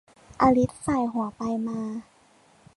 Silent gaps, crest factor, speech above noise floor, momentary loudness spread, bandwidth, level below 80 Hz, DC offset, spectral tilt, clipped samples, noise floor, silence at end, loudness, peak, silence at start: none; 20 dB; 34 dB; 12 LU; 11.5 kHz; -52 dBFS; under 0.1%; -7 dB/octave; under 0.1%; -59 dBFS; 0.75 s; -26 LUFS; -8 dBFS; 0.4 s